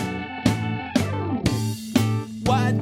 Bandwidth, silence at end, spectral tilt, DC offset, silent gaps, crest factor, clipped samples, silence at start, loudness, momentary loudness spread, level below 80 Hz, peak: 16.5 kHz; 0 s; -6 dB/octave; under 0.1%; none; 20 dB; under 0.1%; 0 s; -24 LUFS; 4 LU; -44 dBFS; -2 dBFS